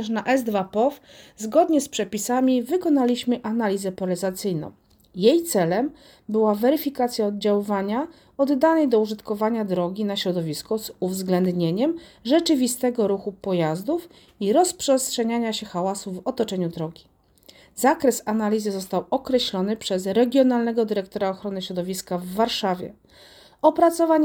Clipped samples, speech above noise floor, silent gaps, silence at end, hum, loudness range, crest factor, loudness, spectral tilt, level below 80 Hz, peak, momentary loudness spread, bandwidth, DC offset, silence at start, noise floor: under 0.1%; 31 dB; none; 0 s; none; 3 LU; 20 dB; -23 LUFS; -5 dB/octave; -62 dBFS; -4 dBFS; 9 LU; over 20 kHz; under 0.1%; 0 s; -54 dBFS